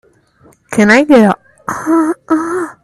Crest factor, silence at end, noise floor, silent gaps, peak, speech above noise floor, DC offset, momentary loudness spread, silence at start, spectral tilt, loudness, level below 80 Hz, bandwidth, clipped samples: 12 dB; 0.1 s; -48 dBFS; none; 0 dBFS; 37 dB; under 0.1%; 14 LU; 0.7 s; -5.5 dB/octave; -11 LUFS; -50 dBFS; 13 kHz; under 0.1%